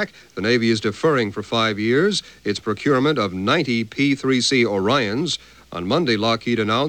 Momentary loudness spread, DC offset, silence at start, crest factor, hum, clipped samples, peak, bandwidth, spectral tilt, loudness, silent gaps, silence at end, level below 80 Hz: 7 LU; 0.1%; 0 s; 14 dB; none; under 0.1%; -6 dBFS; 13.5 kHz; -4.5 dB/octave; -20 LUFS; none; 0 s; -56 dBFS